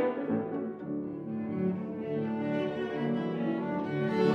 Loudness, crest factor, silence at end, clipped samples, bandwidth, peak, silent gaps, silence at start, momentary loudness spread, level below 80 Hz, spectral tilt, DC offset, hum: -33 LUFS; 18 dB; 0 s; under 0.1%; 6.8 kHz; -14 dBFS; none; 0 s; 6 LU; -70 dBFS; -8.5 dB/octave; under 0.1%; none